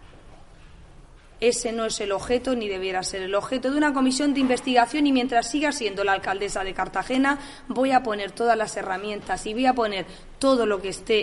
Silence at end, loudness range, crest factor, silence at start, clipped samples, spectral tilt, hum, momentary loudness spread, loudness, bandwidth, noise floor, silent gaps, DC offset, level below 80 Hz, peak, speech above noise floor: 0 s; 3 LU; 18 dB; 0 s; under 0.1%; -3 dB/octave; none; 8 LU; -24 LUFS; 11.5 kHz; -48 dBFS; none; under 0.1%; -48 dBFS; -6 dBFS; 24 dB